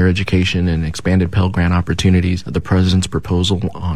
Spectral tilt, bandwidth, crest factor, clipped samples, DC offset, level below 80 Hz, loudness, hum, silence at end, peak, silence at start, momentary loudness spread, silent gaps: -6 dB/octave; 11 kHz; 12 dB; under 0.1%; 2%; -30 dBFS; -16 LUFS; none; 0 s; -4 dBFS; 0 s; 5 LU; none